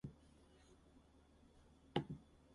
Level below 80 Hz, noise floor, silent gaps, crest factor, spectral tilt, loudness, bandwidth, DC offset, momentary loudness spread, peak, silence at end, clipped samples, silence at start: -70 dBFS; -69 dBFS; none; 32 dB; -7 dB/octave; -48 LUFS; 11 kHz; under 0.1%; 24 LU; -22 dBFS; 0 s; under 0.1%; 0.05 s